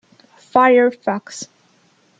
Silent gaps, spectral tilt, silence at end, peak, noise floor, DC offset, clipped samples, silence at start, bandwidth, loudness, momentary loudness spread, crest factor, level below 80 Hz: none; -4.5 dB/octave; 0.75 s; -2 dBFS; -57 dBFS; under 0.1%; under 0.1%; 0.55 s; 9.2 kHz; -16 LUFS; 20 LU; 16 dB; -68 dBFS